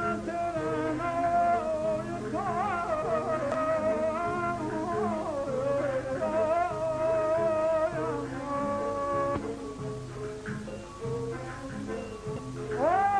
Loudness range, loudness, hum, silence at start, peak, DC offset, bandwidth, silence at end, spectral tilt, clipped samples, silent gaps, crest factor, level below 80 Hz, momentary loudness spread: 6 LU; -30 LUFS; none; 0 s; -16 dBFS; under 0.1%; 10.5 kHz; 0 s; -6.5 dB/octave; under 0.1%; none; 14 dB; -52 dBFS; 11 LU